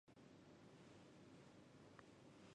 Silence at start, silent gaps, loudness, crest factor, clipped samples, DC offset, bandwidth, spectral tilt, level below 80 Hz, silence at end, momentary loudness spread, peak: 0.05 s; none; -66 LUFS; 22 dB; under 0.1%; under 0.1%; 10 kHz; -5.5 dB/octave; -86 dBFS; 0 s; 1 LU; -44 dBFS